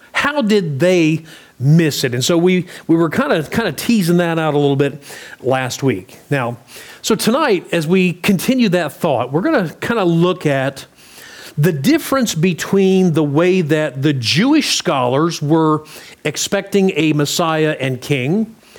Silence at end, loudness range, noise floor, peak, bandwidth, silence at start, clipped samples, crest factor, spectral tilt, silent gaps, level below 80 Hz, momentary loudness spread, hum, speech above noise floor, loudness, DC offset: 0.25 s; 3 LU; -39 dBFS; -2 dBFS; over 20 kHz; 0.15 s; under 0.1%; 12 dB; -5.5 dB/octave; none; -56 dBFS; 8 LU; none; 23 dB; -16 LUFS; under 0.1%